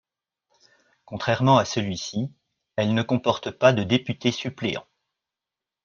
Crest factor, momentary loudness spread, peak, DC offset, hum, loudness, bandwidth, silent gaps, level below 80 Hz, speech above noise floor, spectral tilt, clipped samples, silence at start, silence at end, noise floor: 24 dB; 13 LU; -2 dBFS; under 0.1%; none; -24 LUFS; 7.2 kHz; none; -62 dBFS; 65 dB; -5.5 dB/octave; under 0.1%; 1.1 s; 1.05 s; -88 dBFS